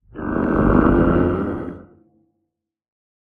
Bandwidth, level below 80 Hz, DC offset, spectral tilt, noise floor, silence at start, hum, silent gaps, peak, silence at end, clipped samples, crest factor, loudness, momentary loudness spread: 3.8 kHz; -32 dBFS; under 0.1%; -11 dB/octave; -77 dBFS; 0.15 s; none; none; -2 dBFS; 1.4 s; under 0.1%; 18 dB; -18 LUFS; 13 LU